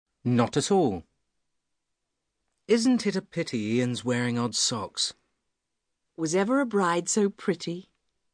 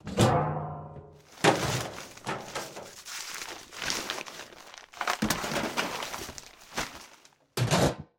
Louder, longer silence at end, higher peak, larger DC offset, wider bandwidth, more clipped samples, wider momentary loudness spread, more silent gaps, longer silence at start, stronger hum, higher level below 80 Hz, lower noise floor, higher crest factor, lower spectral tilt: first, -26 LUFS vs -31 LUFS; first, 0.5 s vs 0.15 s; about the same, -8 dBFS vs -8 dBFS; neither; second, 10 kHz vs 17.5 kHz; neither; second, 8 LU vs 20 LU; neither; first, 0.25 s vs 0.05 s; neither; second, -68 dBFS vs -54 dBFS; first, -82 dBFS vs -58 dBFS; about the same, 20 dB vs 24 dB; about the same, -4.5 dB/octave vs -4 dB/octave